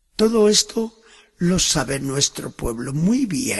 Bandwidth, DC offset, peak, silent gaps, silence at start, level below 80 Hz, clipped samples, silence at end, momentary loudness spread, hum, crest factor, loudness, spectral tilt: 13 kHz; under 0.1%; -2 dBFS; none; 0.2 s; -40 dBFS; under 0.1%; 0 s; 12 LU; none; 18 dB; -19 LUFS; -4 dB/octave